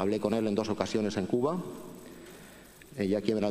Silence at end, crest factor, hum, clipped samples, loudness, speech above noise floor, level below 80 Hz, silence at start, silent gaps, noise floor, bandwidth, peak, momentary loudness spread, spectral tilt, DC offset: 0 s; 20 dB; none; under 0.1%; -30 LUFS; 22 dB; -64 dBFS; 0 s; none; -52 dBFS; 15.5 kHz; -12 dBFS; 20 LU; -6.5 dB/octave; under 0.1%